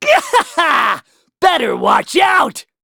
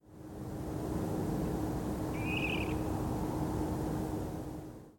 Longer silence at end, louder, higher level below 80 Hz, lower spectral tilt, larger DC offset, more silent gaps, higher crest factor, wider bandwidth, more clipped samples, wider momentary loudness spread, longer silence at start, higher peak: first, 0.2 s vs 0.05 s; first, -13 LUFS vs -36 LUFS; second, -54 dBFS vs -46 dBFS; second, -2.5 dB/octave vs -6.5 dB/octave; neither; neither; about the same, 14 dB vs 14 dB; about the same, 19.5 kHz vs 18 kHz; neither; second, 5 LU vs 9 LU; about the same, 0 s vs 0.05 s; first, 0 dBFS vs -22 dBFS